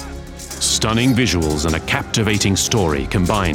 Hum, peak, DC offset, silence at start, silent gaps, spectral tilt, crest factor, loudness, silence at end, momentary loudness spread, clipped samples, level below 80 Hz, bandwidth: none; -2 dBFS; under 0.1%; 0 s; none; -4 dB/octave; 16 dB; -17 LUFS; 0 s; 5 LU; under 0.1%; -32 dBFS; 18 kHz